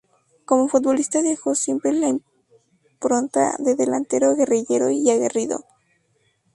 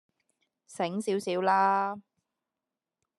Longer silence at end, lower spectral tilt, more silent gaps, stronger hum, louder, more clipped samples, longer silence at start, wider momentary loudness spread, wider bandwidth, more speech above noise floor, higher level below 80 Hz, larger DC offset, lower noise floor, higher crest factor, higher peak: second, 0.95 s vs 1.2 s; about the same, -4 dB/octave vs -5 dB/octave; neither; neither; first, -20 LUFS vs -28 LUFS; neither; second, 0.5 s vs 0.7 s; second, 5 LU vs 10 LU; about the same, 11.5 kHz vs 12.5 kHz; second, 46 dB vs 61 dB; first, -68 dBFS vs -88 dBFS; neither; second, -66 dBFS vs -89 dBFS; about the same, 18 dB vs 20 dB; first, -4 dBFS vs -12 dBFS